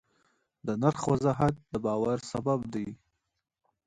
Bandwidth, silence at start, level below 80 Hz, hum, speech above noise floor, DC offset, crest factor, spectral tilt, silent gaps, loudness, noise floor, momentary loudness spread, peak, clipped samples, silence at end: 11 kHz; 0.65 s; -58 dBFS; none; 43 dB; under 0.1%; 22 dB; -7.5 dB/octave; none; -30 LUFS; -72 dBFS; 10 LU; -10 dBFS; under 0.1%; 0.9 s